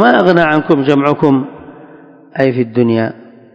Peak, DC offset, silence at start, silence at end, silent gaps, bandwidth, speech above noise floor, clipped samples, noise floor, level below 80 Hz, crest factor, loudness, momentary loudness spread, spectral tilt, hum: 0 dBFS; under 0.1%; 0 s; 0.4 s; none; 8 kHz; 28 dB; 0.6%; -39 dBFS; -54 dBFS; 12 dB; -12 LUFS; 10 LU; -8 dB/octave; none